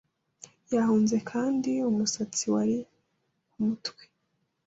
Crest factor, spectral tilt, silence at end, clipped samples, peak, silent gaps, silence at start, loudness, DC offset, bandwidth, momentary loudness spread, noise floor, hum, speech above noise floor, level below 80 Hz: 14 dB; -4.5 dB/octave; 0.75 s; under 0.1%; -14 dBFS; none; 0.7 s; -28 LUFS; under 0.1%; 8 kHz; 8 LU; -76 dBFS; none; 50 dB; -70 dBFS